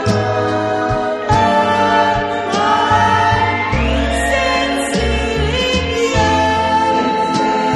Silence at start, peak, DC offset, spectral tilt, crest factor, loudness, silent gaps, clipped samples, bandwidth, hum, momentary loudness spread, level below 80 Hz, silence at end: 0 s; 0 dBFS; under 0.1%; -5 dB/octave; 14 dB; -15 LUFS; none; under 0.1%; 12 kHz; none; 4 LU; -28 dBFS; 0 s